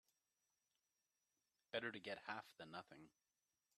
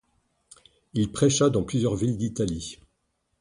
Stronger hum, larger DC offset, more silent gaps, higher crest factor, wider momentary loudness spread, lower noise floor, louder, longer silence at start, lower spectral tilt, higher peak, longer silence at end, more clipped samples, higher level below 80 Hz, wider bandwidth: neither; neither; neither; first, 26 dB vs 18 dB; about the same, 13 LU vs 12 LU; first, under -90 dBFS vs -75 dBFS; second, -51 LUFS vs -25 LUFS; first, 1.75 s vs 0.95 s; about the same, -4.5 dB/octave vs -5.5 dB/octave; second, -32 dBFS vs -8 dBFS; about the same, 0.7 s vs 0.65 s; neither; second, under -90 dBFS vs -50 dBFS; first, 13 kHz vs 11.5 kHz